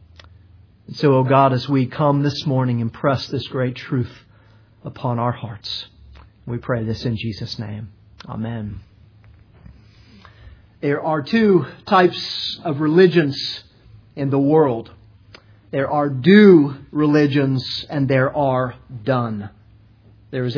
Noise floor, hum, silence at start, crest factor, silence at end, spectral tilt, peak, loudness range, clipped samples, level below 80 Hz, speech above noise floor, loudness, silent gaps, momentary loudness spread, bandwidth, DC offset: -50 dBFS; none; 0.9 s; 20 dB; 0 s; -8 dB/octave; 0 dBFS; 12 LU; under 0.1%; -52 dBFS; 32 dB; -19 LUFS; none; 17 LU; 5.4 kHz; under 0.1%